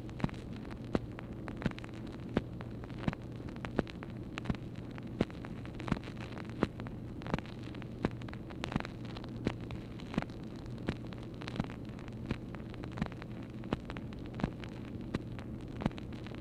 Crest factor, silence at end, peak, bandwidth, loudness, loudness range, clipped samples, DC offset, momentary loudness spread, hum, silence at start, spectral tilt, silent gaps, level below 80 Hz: 30 dB; 0 s; -10 dBFS; 12 kHz; -41 LUFS; 2 LU; under 0.1%; under 0.1%; 7 LU; none; 0 s; -7.5 dB/octave; none; -52 dBFS